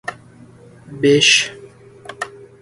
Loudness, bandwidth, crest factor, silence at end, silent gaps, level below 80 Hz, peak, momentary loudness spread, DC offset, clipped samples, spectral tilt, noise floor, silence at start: -13 LUFS; 11.5 kHz; 20 dB; 0.35 s; none; -58 dBFS; 0 dBFS; 20 LU; under 0.1%; under 0.1%; -2.5 dB/octave; -43 dBFS; 0.05 s